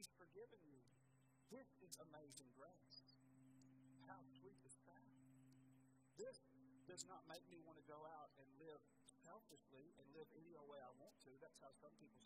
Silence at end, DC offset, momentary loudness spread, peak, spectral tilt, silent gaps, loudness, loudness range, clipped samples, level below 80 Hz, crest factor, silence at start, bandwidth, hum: 0 s; under 0.1%; 9 LU; -34 dBFS; -3.5 dB/octave; none; -64 LUFS; 5 LU; under 0.1%; under -90 dBFS; 32 dB; 0 s; 12.5 kHz; none